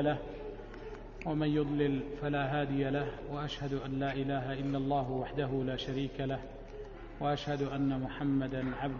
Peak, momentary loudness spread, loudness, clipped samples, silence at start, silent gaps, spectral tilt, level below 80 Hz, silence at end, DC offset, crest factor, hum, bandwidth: -18 dBFS; 14 LU; -35 LUFS; under 0.1%; 0 s; none; -6 dB/octave; -50 dBFS; 0 s; under 0.1%; 16 dB; none; 7 kHz